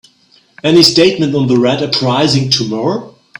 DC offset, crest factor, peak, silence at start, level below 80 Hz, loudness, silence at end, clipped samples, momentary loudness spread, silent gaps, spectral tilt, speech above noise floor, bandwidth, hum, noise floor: under 0.1%; 12 dB; 0 dBFS; 0.65 s; -50 dBFS; -11 LUFS; 0.3 s; under 0.1%; 10 LU; none; -5 dB/octave; 39 dB; 17 kHz; none; -50 dBFS